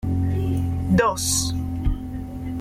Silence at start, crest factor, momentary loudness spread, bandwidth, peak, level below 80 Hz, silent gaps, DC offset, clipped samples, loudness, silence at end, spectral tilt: 0 s; 14 dB; 11 LU; 15.5 kHz; -8 dBFS; -32 dBFS; none; under 0.1%; under 0.1%; -23 LUFS; 0 s; -4.5 dB/octave